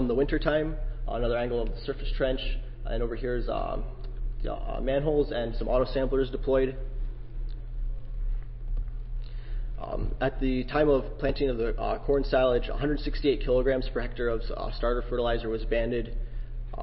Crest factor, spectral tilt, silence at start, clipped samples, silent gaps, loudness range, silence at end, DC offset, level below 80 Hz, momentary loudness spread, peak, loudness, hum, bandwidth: 16 dB; -10.5 dB/octave; 0 s; under 0.1%; none; 7 LU; 0 s; under 0.1%; -32 dBFS; 14 LU; -12 dBFS; -30 LUFS; none; 5.6 kHz